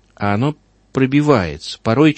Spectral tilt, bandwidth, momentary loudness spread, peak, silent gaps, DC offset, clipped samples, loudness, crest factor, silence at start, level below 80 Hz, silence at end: -7 dB/octave; 8.6 kHz; 11 LU; 0 dBFS; none; under 0.1%; under 0.1%; -17 LUFS; 16 dB; 0.2 s; -44 dBFS; 0 s